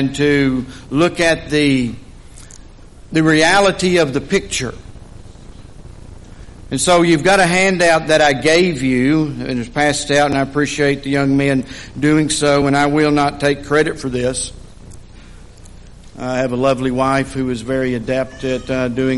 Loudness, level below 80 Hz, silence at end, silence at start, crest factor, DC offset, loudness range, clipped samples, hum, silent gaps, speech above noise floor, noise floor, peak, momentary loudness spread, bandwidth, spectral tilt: -15 LUFS; -38 dBFS; 0 s; 0 s; 14 dB; under 0.1%; 7 LU; under 0.1%; none; none; 23 dB; -39 dBFS; -2 dBFS; 10 LU; 11.5 kHz; -4.5 dB/octave